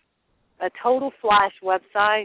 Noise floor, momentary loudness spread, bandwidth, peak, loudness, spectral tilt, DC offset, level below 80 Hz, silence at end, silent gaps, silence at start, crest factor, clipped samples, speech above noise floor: -69 dBFS; 10 LU; 4 kHz; -6 dBFS; -22 LUFS; -7 dB/octave; under 0.1%; -60 dBFS; 0 s; none; 0.6 s; 16 dB; under 0.1%; 48 dB